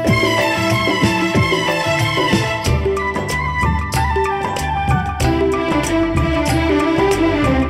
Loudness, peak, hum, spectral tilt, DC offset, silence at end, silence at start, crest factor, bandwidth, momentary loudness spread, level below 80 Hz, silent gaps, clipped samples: -16 LUFS; -2 dBFS; none; -5.5 dB/octave; under 0.1%; 0 s; 0 s; 14 dB; 16 kHz; 4 LU; -28 dBFS; none; under 0.1%